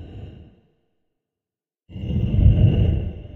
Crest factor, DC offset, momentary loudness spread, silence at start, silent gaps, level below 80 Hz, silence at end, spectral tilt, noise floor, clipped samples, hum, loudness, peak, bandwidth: 18 dB; under 0.1%; 24 LU; 0 s; none; -26 dBFS; 0.05 s; -11 dB/octave; under -90 dBFS; under 0.1%; none; -19 LUFS; -4 dBFS; 3.4 kHz